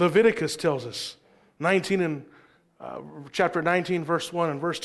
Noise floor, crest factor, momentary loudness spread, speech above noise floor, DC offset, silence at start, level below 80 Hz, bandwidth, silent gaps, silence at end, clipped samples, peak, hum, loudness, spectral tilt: -56 dBFS; 18 dB; 16 LU; 31 dB; under 0.1%; 0 s; -66 dBFS; 12.5 kHz; none; 0 s; under 0.1%; -8 dBFS; none; -26 LUFS; -5 dB/octave